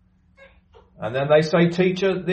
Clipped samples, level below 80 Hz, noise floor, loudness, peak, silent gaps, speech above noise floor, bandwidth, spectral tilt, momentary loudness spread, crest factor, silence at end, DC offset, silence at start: under 0.1%; -56 dBFS; -53 dBFS; -20 LUFS; -6 dBFS; none; 34 dB; 8.6 kHz; -7 dB/octave; 11 LU; 16 dB; 0 s; under 0.1%; 1 s